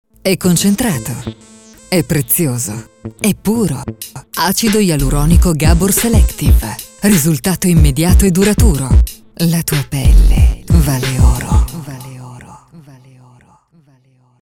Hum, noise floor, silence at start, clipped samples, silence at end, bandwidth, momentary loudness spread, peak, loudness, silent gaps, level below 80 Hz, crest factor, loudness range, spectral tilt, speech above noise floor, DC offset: none; -51 dBFS; 0.25 s; under 0.1%; 1.85 s; 18.5 kHz; 14 LU; 0 dBFS; -13 LUFS; none; -16 dBFS; 12 dB; 5 LU; -5 dB/octave; 40 dB; 0.3%